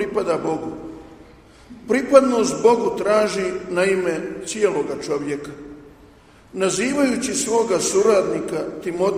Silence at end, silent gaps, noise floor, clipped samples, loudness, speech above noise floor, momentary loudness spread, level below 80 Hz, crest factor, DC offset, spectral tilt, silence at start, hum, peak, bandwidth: 0 s; none; -48 dBFS; under 0.1%; -20 LUFS; 29 dB; 17 LU; -54 dBFS; 20 dB; under 0.1%; -4 dB/octave; 0 s; none; 0 dBFS; 15.5 kHz